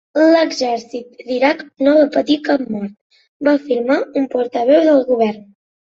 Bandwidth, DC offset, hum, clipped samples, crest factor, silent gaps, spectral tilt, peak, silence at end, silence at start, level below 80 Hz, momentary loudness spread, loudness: 7.6 kHz; under 0.1%; none; under 0.1%; 14 dB; 3.01-3.10 s, 3.28-3.40 s; -5 dB/octave; -2 dBFS; 0.5 s; 0.15 s; -62 dBFS; 12 LU; -16 LUFS